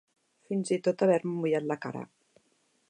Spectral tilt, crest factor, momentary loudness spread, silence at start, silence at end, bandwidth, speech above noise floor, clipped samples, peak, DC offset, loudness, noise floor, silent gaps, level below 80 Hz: -6.5 dB/octave; 18 dB; 14 LU; 0.5 s; 0.85 s; 10.5 kHz; 43 dB; under 0.1%; -12 dBFS; under 0.1%; -29 LUFS; -71 dBFS; none; -82 dBFS